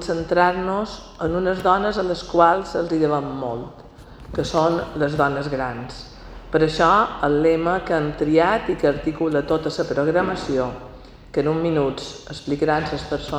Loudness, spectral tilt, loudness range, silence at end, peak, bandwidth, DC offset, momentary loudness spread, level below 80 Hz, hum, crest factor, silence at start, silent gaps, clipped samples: -21 LUFS; -6.5 dB/octave; 4 LU; 0 s; 0 dBFS; 11 kHz; under 0.1%; 14 LU; -42 dBFS; none; 20 dB; 0 s; none; under 0.1%